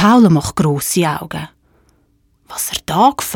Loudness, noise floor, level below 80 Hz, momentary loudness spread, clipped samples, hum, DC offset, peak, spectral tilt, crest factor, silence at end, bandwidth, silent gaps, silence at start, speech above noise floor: -15 LUFS; -57 dBFS; -44 dBFS; 17 LU; under 0.1%; none; under 0.1%; 0 dBFS; -5 dB/octave; 14 dB; 0 s; 18.5 kHz; none; 0 s; 44 dB